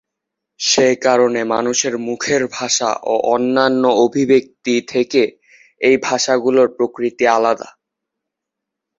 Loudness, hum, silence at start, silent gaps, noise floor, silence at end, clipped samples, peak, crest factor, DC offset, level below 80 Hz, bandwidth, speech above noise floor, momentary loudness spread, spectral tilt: -16 LUFS; none; 0.6 s; none; -81 dBFS; 1.3 s; under 0.1%; -2 dBFS; 16 dB; under 0.1%; -62 dBFS; 7.8 kHz; 66 dB; 6 LU; -3 dB/octave